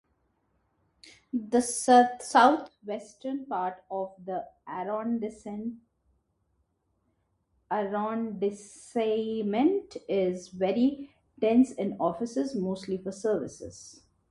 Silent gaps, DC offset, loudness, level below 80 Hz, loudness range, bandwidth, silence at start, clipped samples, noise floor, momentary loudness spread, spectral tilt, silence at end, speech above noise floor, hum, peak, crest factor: none; under 0.1%; -28 LUFS; -68 dBFS; 11 LU; 11.5 kHz; 1.05 s; under 0.1%; -75 dBFS; 17 LU; -5 dB/octave; 0.4 s; 47 dB; none; -8 dBFS; 22 dB